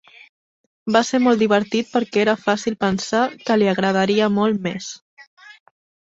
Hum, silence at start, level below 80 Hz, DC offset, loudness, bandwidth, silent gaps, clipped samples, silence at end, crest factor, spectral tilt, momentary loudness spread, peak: none; 0.85 s; -60 dBFS; under 0.1%; -19 LUFS; 8 kHz; 5.02-5.17 s, 5.27-5.37 s; under 0.1%; 0.5 s; 18 dB; -5 dB/octave; 9 LU; -2 dBFS